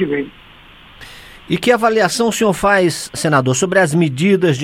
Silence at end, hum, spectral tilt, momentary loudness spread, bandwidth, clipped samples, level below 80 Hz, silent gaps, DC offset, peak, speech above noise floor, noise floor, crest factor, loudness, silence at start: 0 s; none; -5 dB/octave; 9 LU; 16.5 kHz; under 0.1%; -46 dBFS; none; under 0.1%; 0 dBFS; 27 dB; -42 dBFS; 16 dB; -15 LUFS; 0 s